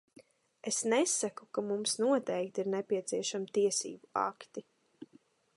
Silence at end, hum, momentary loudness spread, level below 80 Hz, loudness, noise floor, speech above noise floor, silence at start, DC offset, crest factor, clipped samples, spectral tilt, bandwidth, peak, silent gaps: 0.5 s; none; 9 LU; -86 dBFS; -33 LUFS; -66 dBFS; 32 dB; 0.65 s; under 0.1%; 18 dB; under 0.1%; -3 dB/octave; 11.5 kHz; -18 dBFS; none